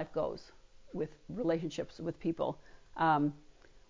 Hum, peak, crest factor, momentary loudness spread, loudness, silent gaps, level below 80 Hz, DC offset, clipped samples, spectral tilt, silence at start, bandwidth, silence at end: none; -18 dBFS; 18 dB; 17 LU; -35 LUFS; none; -62 dBFS; under 0.1%; under 0.1%; -7 dB/octave; 0 s; 7.6 kHz; 0.1 s